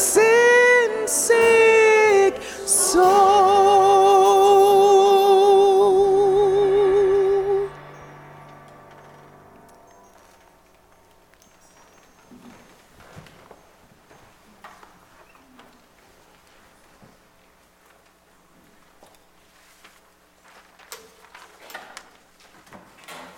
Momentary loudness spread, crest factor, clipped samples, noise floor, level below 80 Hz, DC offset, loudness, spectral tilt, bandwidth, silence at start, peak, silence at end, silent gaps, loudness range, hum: 10 LU; 14 dB; under 0.1%; -56 dBFS; -56 dBFS; under 0.1%; -16 LUFS; -2.5 dB/octave; 16.5 kHz; 0 s; -6 dBFS; 0.15 s; none; 10 LU; none